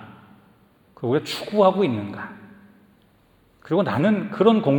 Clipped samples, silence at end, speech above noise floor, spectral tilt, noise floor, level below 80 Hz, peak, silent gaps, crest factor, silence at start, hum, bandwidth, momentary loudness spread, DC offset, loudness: under 0.1%; 0 s; 38 dB; -7 dB/octave; -58 dBFS; -66 dBFS; -4 dBFS; none; 20 dB; 0 s; none; 19 kHz; 14 LU; under 0.1%; -21 LUFS